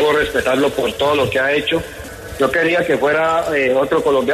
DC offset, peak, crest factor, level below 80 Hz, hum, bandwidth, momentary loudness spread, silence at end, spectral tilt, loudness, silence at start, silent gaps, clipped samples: under 0.1%; -4 dBFS; 14 dB; -42 dBFS; none; 14.5 kHz; 5 LU; 0 s; -4.5 dB/octave; -16 LUFS; 0 s; none; under 0.1%